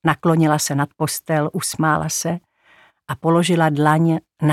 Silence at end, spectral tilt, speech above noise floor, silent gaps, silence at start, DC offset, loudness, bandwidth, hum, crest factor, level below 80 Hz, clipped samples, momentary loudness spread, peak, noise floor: 0 s; -5 dB/octave; 36 dB; none; 0.05 s; under 0.1%; -19 LUFS; 15.5 kHz; none; 18 dB; -56 dBFS; under 0.1%; 8 LU; 0 dBFS; -54 dBFS